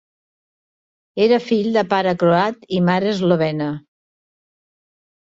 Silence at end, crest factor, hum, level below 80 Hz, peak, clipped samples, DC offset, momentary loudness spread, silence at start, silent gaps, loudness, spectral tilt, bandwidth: 1.6 s; 16 dB; none; -60 dBFS; -4 dBFS; under 0.1%; under 0.1%; 9 LU; 1.15 s; none; -18 LUFS; -7 dB/octave; 7.6 kHz